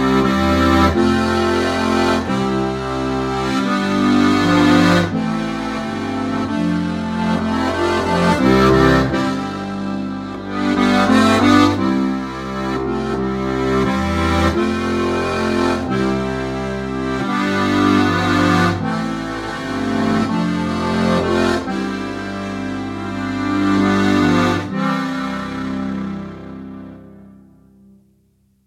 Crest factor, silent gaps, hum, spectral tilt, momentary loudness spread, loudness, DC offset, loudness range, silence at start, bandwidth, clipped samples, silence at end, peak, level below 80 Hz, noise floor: 18 dB; none; none; -6 dB/octave; 11 LU; -17 LUFS; under 0.1%; 4 LU; 0 s; 15 kHz; under 0.1%; 1.35 s; 0 dBFS; -36 dBFS; -58 dBFS